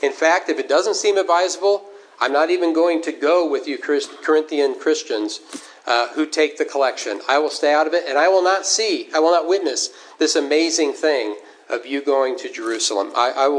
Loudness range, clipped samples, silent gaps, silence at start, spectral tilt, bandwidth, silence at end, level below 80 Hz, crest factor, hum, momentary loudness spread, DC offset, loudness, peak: 3 LU; under 0.1%; none; 0 s; 0 dB/octave; 10.5 kHz; 0 s; -88 dBFS; 18 dB; none; 8 LU; under 0.1%; -19 LUFS; -2 dBFS